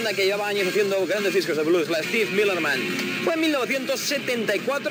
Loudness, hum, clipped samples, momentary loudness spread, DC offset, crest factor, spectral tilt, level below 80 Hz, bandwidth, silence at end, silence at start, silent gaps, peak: -23 LUFS; none; under 0.1%; 3 LU; under 0.1%; 14 dB; -3.5 dB/octave; -76 dBFS; 19 kHz; 0 s; 0 s; none; -8 dBFS